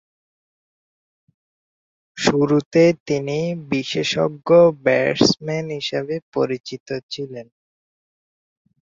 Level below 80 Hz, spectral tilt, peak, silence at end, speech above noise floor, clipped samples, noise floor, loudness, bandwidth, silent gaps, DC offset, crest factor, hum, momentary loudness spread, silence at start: -58 dBFS; -5.5 dB/octave; -2 dBFS; 1.55 s; over 71 dB; under 0.1%; under -90 dBFS; -19 LUFS; 7.8 kHz; 2.66-2.71 s, 3.00-3.06 s, 6.22-6.32 s, 6.60-6.64 s, 6.80-6.86 s, 7.03-7.09 s; under 0.1%; 20 dB; none; 14 LU; 2.15 s